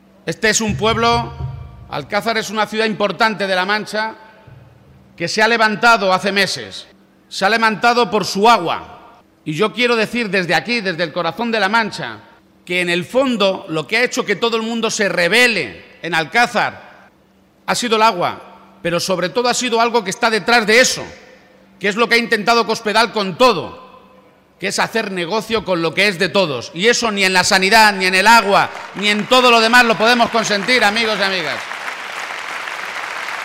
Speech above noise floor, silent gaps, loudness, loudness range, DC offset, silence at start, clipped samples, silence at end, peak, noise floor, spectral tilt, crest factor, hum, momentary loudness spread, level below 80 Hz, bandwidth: 37 dB; none; -15 LUFS; 6 LU; under 0.1%; 0.25 s; under 0.1%; 0 s; -2 dBFS; -52 dBFS; -3 dB/octave; 14 dB; none; 14 LU; -48 dBFS; 16 kHz